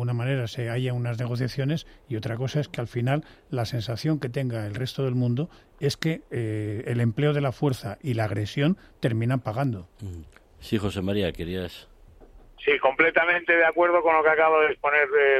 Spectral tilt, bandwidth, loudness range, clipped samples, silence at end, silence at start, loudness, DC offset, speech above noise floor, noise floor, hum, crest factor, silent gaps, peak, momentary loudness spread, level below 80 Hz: -6.5 dB/octave; 14.5 kHz; 7 LU; under 0.1%; 0 s; 0 s; -25 LUFS; under 0.1%; 25 dB; -50 dBFS; none; 20 dB; none; -6 dBFS; 12 LU; -54 dBFS